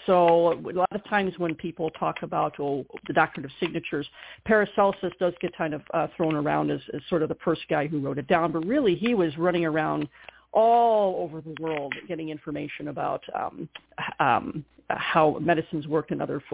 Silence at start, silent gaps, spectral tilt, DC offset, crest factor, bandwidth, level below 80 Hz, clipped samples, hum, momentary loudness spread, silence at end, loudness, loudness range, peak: 0 s; none; -10 dB/octave; under 0.1%; 20 dB; 4 kHz; -60 dBFS; under 0.1%; none; 12 LU; 0.05 s; -26 LUFS; 5 LU; -6 dBFS